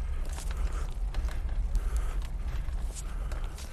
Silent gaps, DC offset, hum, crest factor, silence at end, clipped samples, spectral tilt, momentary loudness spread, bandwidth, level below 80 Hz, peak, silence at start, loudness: none; under 0.1%; none; 14 dB; 0 s; under 0.1%; -5 dB/octave; 4 LU; 13 kHz; -32 dBFS; -18 dBFS; 0 s; -37 LUFS